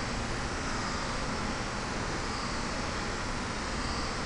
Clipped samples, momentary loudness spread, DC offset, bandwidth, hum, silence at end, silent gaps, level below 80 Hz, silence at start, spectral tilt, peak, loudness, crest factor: under 0.1%; 1 LU; under 0.1%; 10 kHz; none; 0 s; none; -40 dBFS; 0 s; -4 dB/octave; -20 dBFS; -34 LUFS; 14 dB